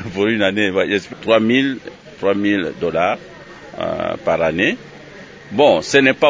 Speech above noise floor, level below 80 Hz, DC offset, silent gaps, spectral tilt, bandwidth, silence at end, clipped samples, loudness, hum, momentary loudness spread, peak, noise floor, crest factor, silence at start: 22 dB; -50 dBFS; under 0.1%; none; -5 dB/octave; 8 kHz; 0 s; under 0.1%; -17 LUFS; none; 23 LU; 0 dBFS; -38 dBFS; 18 dB; 0 s